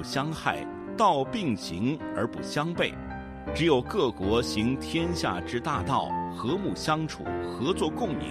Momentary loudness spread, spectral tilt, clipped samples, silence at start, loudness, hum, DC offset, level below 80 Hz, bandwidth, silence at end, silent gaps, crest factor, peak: 8 LU; -5.5 dB/octave; under 0.1%; 0 s; -28 LUFS; none; under 0.1%; -48 dBFS; 14.5 kHz; 0 s; none; 18 dB; -10 dBFS